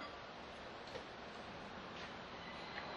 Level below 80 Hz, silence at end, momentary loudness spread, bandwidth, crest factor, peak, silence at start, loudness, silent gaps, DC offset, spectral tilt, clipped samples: -68 dBFS; 0 s; 3 LU; 11 kHz; 20 dB; -30 dBFS; 0 s; -50 LUFS; none; under 0.1%; -4 dB/octave; under 0.1%